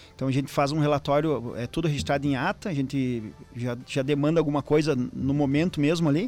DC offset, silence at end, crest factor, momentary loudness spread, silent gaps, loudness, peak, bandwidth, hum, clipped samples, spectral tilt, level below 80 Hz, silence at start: under 0.1%; 0 s; 14 dB; 7 LU; none; -26 LUFS; -10 dBFS; 14.5 kHz; none; under 0.1%; -7 dB/octave; -50 dBFS; 0 s